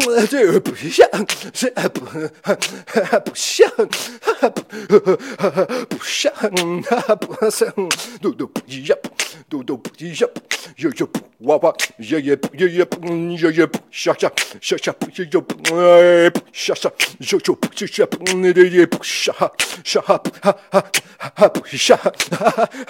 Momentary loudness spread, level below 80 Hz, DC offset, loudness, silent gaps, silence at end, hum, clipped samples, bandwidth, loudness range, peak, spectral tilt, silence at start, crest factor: 10 LU; -66 dBFS; under 0.1%; -17 LUFS; none; 0.05 s; none; under 0.1%; 17 kHz; 6 LU; 0 dBFS; -3.5 dB/octave; 0 s; 18 dB